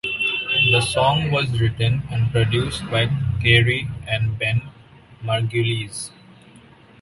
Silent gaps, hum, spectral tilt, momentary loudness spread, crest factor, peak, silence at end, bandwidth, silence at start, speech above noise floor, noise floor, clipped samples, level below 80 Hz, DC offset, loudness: none; none; -5 dB/octave; 10 LU; 18 dB; -2 dBFS; 0.95 s; 11.5 kHz; 0.05 s; 28 dB; -48 dBFS; under 0.1%; -42 dBFS; under 0.1%; -20 LUFS